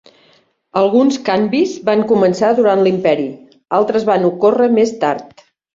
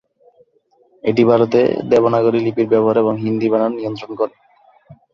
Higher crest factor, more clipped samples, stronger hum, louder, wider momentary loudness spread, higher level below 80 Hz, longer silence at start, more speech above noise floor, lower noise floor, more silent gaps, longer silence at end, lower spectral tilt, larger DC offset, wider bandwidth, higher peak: about the same, 14 dB vs 16 dB; neither; neither; about the same, -14 LUFS vs -16 LUFS; second, 7 LU vs 10 LU; about the same, -58 dBFS vs -58 dBFS; second, 0.75 s vs 1.05 s; about the same, 41 dB vs 42 dB; second, -54 dBFS vs -58 dBFS; neither; first, 0.5 s vs 0.2 s; second, -6 dB/octave vs -8 dB/octave; neither; first, 7.8 kHz vs 7 kHz; about the same, -2 dBFS vs -2 dBFS